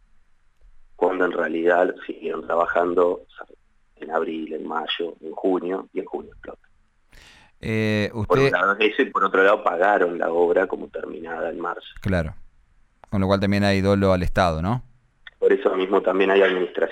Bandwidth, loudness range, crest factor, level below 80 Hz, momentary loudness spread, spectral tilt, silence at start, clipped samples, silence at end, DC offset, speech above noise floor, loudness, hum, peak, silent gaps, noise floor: 12.5 kHz; 8 LU; 16 dB; -44 dBFS; 13 LU; -7 dB/octave; 1 s; under 0.1%; 0 s; under 0.1%; 35 dB; -22 LUFS; none; -6 dBFS; none; -57 dBFS